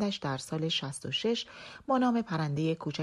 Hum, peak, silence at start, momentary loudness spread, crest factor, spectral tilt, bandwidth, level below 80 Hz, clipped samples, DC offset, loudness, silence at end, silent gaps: none; -16 dBFS; 0 s; 7 LU; 16 dB; -5.5 dB/octave; 12.5 kHz; -66 dBFS; under 0.1%; under 0.1%; -31 LUFS; 0 s; none